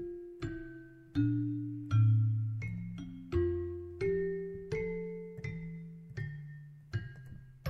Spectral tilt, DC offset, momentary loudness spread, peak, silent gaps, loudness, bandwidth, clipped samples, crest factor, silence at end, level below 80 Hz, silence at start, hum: -9.5 dB/octave; under 0.1%; 17 LU; -20 dBFS; none; -36 LUFS; 6.2 kHz; under 0.1%; 16 dB; 0 s; -54 dBFS; 0 s; none